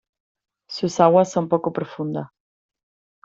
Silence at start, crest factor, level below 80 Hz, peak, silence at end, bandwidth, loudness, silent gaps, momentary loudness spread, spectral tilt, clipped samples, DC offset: 0.7 s; 20 dB; -66 dBFS; -2 dBFS; 1 s; 8 kHz; -20 LUFS; none; 16 LU; -6.5 dB/octave; under 0.1%; under 0.1%